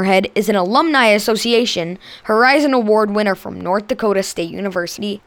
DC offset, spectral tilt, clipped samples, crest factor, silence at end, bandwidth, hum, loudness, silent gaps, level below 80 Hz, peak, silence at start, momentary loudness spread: under 0.1%; -4 dB/octave; under 0.1%; 14 dB; 0.1 s; 19 kHz; none; -16 LUFS; none; -54 dBFS; -2 dBFS; 0 s; 11 LU